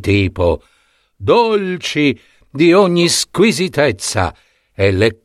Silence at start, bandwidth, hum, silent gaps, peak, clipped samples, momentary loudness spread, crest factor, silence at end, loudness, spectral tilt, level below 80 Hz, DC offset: 0 s; 14.5 kHz; none; none; 0 dBFS; under 0.1%; 10 LU; 14 dB; 0.1 s; -14 LUFS; -4.5 dB/octave; -40 dBFS; under 0.1%